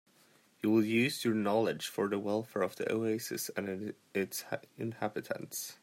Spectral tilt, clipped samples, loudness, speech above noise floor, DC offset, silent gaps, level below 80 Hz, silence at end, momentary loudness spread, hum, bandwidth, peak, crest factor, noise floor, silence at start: -4.5 dB/octave; under 0.1%; -34 LUFS; 32 dB; under 0.1%; none; -80 dBFS; 0.1 s; 10 LU; none; 16 kHz; -16 dBFS; 18 dB; -66 dBFS; 0.65 s